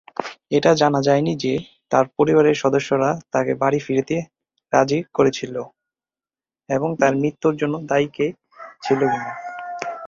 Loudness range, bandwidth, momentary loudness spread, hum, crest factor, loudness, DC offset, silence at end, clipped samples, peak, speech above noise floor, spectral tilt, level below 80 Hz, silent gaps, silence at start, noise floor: 4 LU; 7.6 kHz; 14 LU; none; 18 dB; -20 LUFS; under 0.1%; 0 s; under 0.1%; -2 dBFS; over 71 dB; -6 dB/octave; -58 dBFS; none; 0.2 s; under -90 dBFS